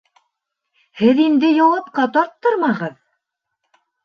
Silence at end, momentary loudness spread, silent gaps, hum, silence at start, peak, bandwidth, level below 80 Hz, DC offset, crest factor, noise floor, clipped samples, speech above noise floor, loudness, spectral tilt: 1.15 s; 7 LU; none; none; 0.95 s; -2 dBFS; 6.6 kHz; -66 dBFS; under 0.1%; 16 dB; -76 dBFS; under 0.1%; 61 dB; -16 LUFS; -7 dB/octave